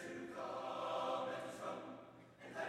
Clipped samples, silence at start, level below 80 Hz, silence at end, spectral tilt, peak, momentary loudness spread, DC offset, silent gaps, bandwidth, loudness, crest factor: under 0.1%; 0 s; -82 dBFS; 0 s; -4.5 dB/octave; -30 dBFS; 15 LU; under 0.1%; none; 15.5 kHz; -45 LUFS; 16 dB